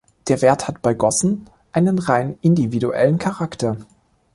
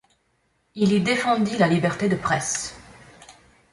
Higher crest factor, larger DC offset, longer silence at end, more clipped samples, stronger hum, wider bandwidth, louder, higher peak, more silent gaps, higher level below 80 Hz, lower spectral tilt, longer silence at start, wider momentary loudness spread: about the same, 18 dB vs 18 dB; neither; about the same, 0.5 s vs 0.4 s; neither; neither; about the same, 11.5 kHz vs 11.5 kHz; first, -19 LUFS vs -22 LUFS; first, -2 dBFS vs -6 dBFS; neither; about the same, -52 dBFS vs -56 dBFS; first, -6 dB/octave vs -4.5 dB/octave; second, 0.25 s vs 0.75 s; about the same, 8 LU vs 8 LU